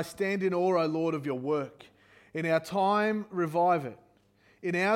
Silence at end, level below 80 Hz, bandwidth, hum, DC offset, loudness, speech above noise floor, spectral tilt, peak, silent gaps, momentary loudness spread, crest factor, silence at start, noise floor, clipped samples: 0 s; -74 dBFS; 16.5 kHz; none; under 0.1%; -29 LUFS; 36 dB; -6.5 dB/octave; -14 dBFS; none; 9 LU; 16 dB; 0 s; -64 dBFS; under 0.1%